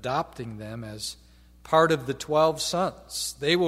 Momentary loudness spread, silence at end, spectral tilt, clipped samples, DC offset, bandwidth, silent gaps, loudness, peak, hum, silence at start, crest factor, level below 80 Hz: 16 LU; 0 s; -4 dB/octave; under 0.1%; under 0.1%; 16 kHz; none; -26 LUFS; -6 dBFS; none; 0 s; 20 dB; -54 dBFS